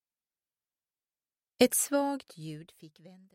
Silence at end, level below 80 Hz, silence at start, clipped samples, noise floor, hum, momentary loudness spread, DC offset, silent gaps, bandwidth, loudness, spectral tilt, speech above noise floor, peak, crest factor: 0.25 s; -74 dBFS; 1.6 s; under 0.1%; under -90 dBFS; none; 19 LU; under 0.1%; none; 16.5 kHz; -28 LUFS; -3 dB/octave; over 59 dB; -10 dBFS; 24 dB